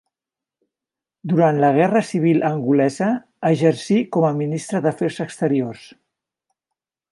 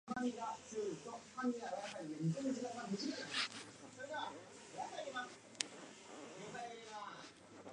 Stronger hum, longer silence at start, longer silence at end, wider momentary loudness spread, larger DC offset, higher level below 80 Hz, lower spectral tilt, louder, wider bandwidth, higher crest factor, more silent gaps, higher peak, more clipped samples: neither; first, 1.25 s vs 0.05 s; first, 1.25 s vs 0 s; second, 8 LU vs 13 LU; neither; first, -68 dBFS vs -82 dBFS; first, -7 dB/octave vs -4 dB/octave; first, -19 LUFS vs -45 LUFS; about the same, 11.5 kHz vs 11 kHz; second, 18 dB vs 34 dB; neither; first, -2 dBFS vs -12 dBFS; neither